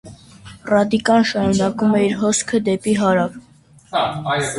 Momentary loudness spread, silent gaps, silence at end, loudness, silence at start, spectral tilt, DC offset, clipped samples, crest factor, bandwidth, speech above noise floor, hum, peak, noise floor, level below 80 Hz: 6 LU; none; 0 s; -18 LUFS; 0.05 s; -4.5 dB/octave; under 0.1%; under 0.1%; 16 dB; 11.5 kHz; 31 dB; none; -2 dBFS; -48 dBFS; -50 dBFS